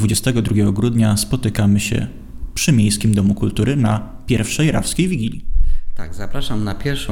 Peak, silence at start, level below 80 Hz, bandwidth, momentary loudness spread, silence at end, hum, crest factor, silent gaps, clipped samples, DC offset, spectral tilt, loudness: -2 dBFS; 0 s; -24 dBFS; 17 kHz; 12 LU; 0 s; none; 14 dB; none; under 0.1%; under 0.1%; -5.5 dB/octave; -18 LUFS